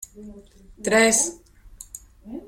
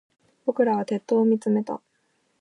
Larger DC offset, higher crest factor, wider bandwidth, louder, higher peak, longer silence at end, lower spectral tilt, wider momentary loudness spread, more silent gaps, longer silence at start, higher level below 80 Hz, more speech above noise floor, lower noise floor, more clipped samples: neither; about the same, 20 dB vs 16 dB; first, 16.5 kHz vs 10.5 kHz; first, -19 LUFS vs -24 LUFS; about the same, -6 dBFS vs -8 dBFS; second, 0.1 s vs 0.65 s; second, -2 dB/octave vs -8 dB/octave; first, 24 LU vs 11 LU; neither; second, 0.15 s vs 0.45 s; first, -52 dBFS vs -80 dBFS; second, 24 dB vs 47 dB; second, -46 dBFS vs -70 dBFS; neither